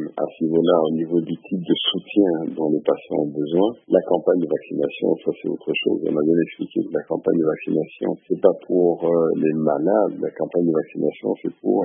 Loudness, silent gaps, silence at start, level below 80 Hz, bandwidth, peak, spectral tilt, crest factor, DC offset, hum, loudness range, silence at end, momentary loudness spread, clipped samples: -21 LUFS; none; 0 s; -70 dBFS; 3.7 kHz; 0 dBFS; -11 dB/octave; 20 dB; under 0.1%; none; 2 LU; 0 s; 7 LU; under 0.1%